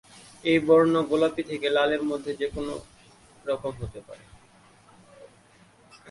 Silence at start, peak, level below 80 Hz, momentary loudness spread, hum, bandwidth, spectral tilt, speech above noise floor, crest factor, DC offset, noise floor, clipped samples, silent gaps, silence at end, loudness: 0.45 s; -8 dBFS; -54 dBFS; 19 LU; none; 11.5 kHz; -6 dB/octave; 32 dB; 20 dB; under 0.1%; -57 dBFS; under 0.1%; none; 0 s; -25 LUFS